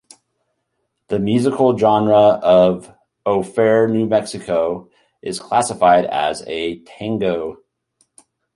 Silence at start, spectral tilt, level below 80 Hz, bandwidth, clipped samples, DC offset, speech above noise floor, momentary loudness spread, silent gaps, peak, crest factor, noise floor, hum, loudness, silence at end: 1.1 s; -5.5 dB/octave; -54 dBFS; 11.5 kHz; under 0.1%; under 0.1%; 56 dB; 15 LU; none; -2 dBFS; 16 dB; -72 dBFS; none; -17 LUFS; 1 s